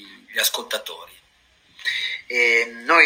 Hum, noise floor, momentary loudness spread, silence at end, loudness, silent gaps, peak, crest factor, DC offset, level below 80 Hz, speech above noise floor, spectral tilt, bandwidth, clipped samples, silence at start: none; -58 dBFS; 12 LU; 0 s; -21 LUFS; none; -2 dBFS; 22 dB; under 0.1%; -70 dBFS; 38 dB; 0.5 dB/octave; 16.5 kHz; under 0.1%; 0 s